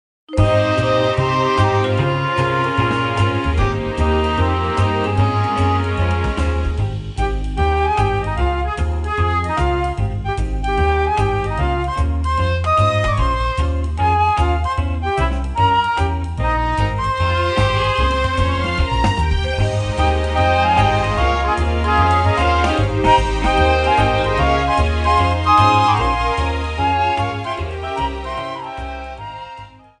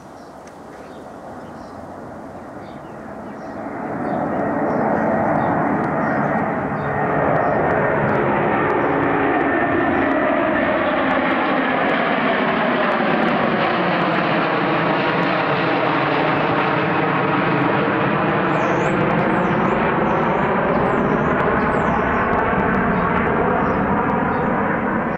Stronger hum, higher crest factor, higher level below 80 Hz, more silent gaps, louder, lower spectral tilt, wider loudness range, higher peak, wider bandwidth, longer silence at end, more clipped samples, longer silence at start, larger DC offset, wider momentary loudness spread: neither; about the same, 16 dB vs 14 dB; first, -24 dBFS vs -44 dBFS; neither; about the same, -17 LUFS vs -18 LUFS; about the same, -6.5 dB/octave vs -7.5 dB/octave; about the same, 4 LU vs 6 LU; first, 0 dBFS vs -6 dBFS; first, 10.5 kHz vs 8.8 kHz; first, 0.3 s vs 0 s; neither; first, 0.3 s vs 0 s; neither; second, 8 LU vs 16 LU